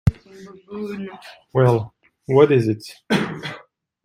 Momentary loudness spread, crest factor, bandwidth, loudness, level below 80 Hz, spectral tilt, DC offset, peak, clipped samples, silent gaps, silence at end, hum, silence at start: 21 LU; 18 dB; 15 kHz; -20 LUFS; -44 dBFS; -7.5 dB/octave; under 0.1%; -2 dBFS; under 0.1%; none; 0.45 s; none; 0.05 s